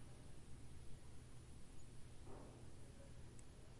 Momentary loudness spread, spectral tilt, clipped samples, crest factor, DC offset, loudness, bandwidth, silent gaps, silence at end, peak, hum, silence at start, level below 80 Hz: 3 LU; -5.5 dB/octave; under 0.1%; 14 dB; under 0.1%; -61 LUFS; 11.5 kHz; none; 0 s; -40 dBFS; none; 0 s; -64 dBFS